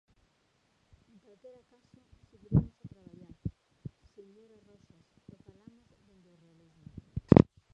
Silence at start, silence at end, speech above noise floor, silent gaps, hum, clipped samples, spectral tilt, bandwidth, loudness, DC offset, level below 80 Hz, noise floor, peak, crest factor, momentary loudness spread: 2.5 s; 0.35 s; 39 dB; none; none; under 0.1%; -10.5 dB/octave; 6.8 kHz; -28 LUFS; under 0.1%; -50 dBFS; -73 dBFS; -2 dBFS; 32 dB; 30 LU